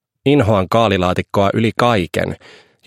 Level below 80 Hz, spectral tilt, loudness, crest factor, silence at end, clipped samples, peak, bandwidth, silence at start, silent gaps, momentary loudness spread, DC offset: -46 dBFS; -6.5 dB/octave; -16 LUFS; 16 dB; 0.5 s; under 0.1%; 0 dBFS; 15.5 kHz; 0.25 s; none; 8 LU; under 0.1%